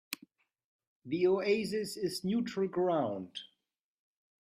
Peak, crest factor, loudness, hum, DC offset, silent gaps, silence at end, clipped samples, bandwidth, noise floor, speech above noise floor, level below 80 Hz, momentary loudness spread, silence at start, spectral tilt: -16 dBFS; 18 dB; -33 LUFS; none; under 0.1%; 0.64-0.79 s, 0.87-1.02 s; 1.1 s; under 0.1%; 15.5 kHz; -84 dBFS; 52 dB; -76 dBFS; 14 LU; 0.1 s; -5.5 dB/octave